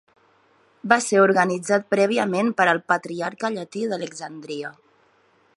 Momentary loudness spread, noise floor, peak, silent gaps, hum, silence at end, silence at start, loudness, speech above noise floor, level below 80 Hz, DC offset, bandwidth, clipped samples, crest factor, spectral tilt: 15 LU; -61 dBFS; 0 dBFS; none; none; 0.85 s; 0.85 s; -22 LUFS; 39 dB; -74 dBFS; under 0.1%; 11.5 kHz; under 0.1%; 22 dB; -4.5 dB/octave